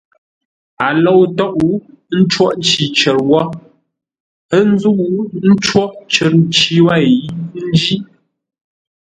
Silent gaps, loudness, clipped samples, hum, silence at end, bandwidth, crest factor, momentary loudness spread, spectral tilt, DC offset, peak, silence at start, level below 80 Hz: 4.20-4.49 s; -13 LUFS; under 0.1%; none; 0.95 s; 9.4 kHz; 14 dB; 9 LU; -5 dB/octave; under 0.1%; 0 dBFS; 0.8 s; -50 dBFS